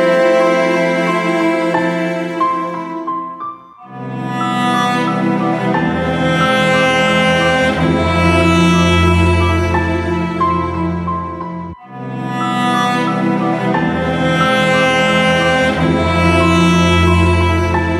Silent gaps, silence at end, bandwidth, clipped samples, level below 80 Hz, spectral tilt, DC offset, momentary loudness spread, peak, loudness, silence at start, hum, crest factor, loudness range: none; 0 s; 12.5 kHz; under 0.1%; -32 dBFS; -6 dB/octave; under 0.1%; 11 LU; 0 dBFS; -14 LUFS; 0 s; none; 14 dB; 6 LU